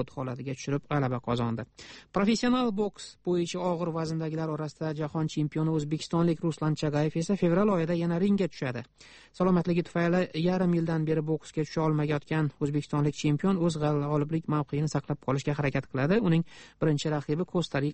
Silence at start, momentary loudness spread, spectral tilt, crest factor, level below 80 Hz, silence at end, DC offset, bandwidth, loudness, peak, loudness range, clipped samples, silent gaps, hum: 0 s; 8 LU; -7 dB/octave; 16 dB; -56 dBFS; 0 s; under 0.1%; 8.4 kHz; -29 LUFS; -12 dBFS; 2 LU; under 0.1%; none; none